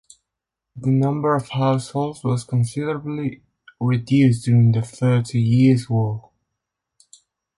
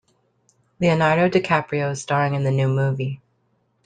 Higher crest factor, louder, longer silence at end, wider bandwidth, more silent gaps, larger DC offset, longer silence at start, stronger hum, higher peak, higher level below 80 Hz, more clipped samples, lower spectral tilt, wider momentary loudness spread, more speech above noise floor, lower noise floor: about the same, 16 dB vs 18 dB; about the same, -20 LUFS vs -21 LUFS; first, 1.35 s vs 0.7 s; first, 11.5 kHz vs 9.4 kHz; neither; neither; about the same, 0.75 s vs 0.8 s; neither; about the same, -4 dBFS vs -4 dBFS; about the same, -56 dBFS vs -58 dBFS; neither; first, -8 dB/octave vs -6.5 dB/octave; about the same, 10 LU vs 8 LU; first, 65 dB vs 47 dB; first, -83 dBFS vs -67 dBFS